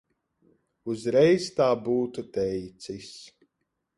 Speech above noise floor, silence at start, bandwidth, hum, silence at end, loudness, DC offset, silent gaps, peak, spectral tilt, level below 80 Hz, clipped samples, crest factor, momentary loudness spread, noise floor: 54 dB; 0.85 s; 11.5 kHz; none; 0.7 s; -25 LUFS; under 0.1%; none; -10 dBFS; -6 dB/octave; -62 dBFS; under 0.1%; 18 dB; 19 LU; -80 dBFS